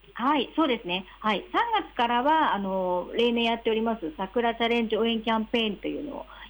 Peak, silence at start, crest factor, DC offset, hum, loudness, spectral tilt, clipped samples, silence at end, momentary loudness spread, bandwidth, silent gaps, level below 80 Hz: -14 dBFS; 0.1 s; 14 dB; under 0.1%; none; -26 LUFS; -6 dB/octave; under 0.1%; 0 s; 7 LU; over 20 kHz; none; -54 dBFS